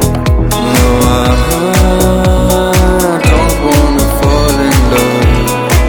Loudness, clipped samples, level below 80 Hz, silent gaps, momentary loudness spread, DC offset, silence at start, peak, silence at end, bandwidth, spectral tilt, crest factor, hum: -10 LUFS; 0.3%; -14 dBFS; none; 2 LU; under 0.1%; 0 s; 0 dBFS; 0 s; over 20 kHz; -5.5 dB/octave; 8 dB; none